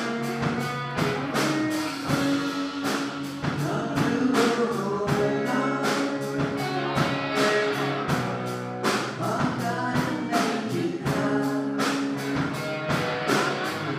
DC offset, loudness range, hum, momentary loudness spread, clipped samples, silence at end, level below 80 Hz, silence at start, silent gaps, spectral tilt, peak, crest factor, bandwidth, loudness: under 0.1%; 2 LU; none; 5 LU; under 0.1%; 0 s; -56 dBFS; 0 s; none; -5 dB/octave; -10 dBFS; 16 dB; 15.5 kHz; -26 LUFS